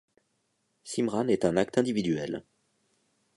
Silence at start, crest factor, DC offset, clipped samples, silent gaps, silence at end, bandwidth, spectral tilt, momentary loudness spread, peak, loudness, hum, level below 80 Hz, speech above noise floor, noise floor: 0.85 s; 22 dB; under 0.1%; under 0.1%; none; 0.95 s; 11.5 kHz; -6 dB/octave; 11 LU; -10 dBFS; -28 LUFS; none; -62 dBFS; 48 dB; -76 dBFS